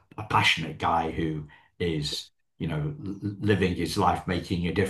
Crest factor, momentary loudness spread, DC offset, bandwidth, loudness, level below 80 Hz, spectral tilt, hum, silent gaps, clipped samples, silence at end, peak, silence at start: 20 dB; 12 LU; under 0.1%; 12.5 kHz; -27 LUFS; -50 dBFS; -5 dB/octave; none; none; under 0.1%; 0 s; -8 dBFS; 0.2 s